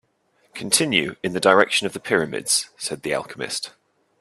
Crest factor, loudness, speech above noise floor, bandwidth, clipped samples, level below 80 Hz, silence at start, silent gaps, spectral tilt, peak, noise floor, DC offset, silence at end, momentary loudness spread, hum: 22 dB; -21 LUFS; 43 dB; 15 kHz; under 0.1%; -64 dBFS; 0.55 s; none; -2 dB/octave; 0 dBFS; -64 dBFS; under 0.1%; 0.5 s; 12 LU; none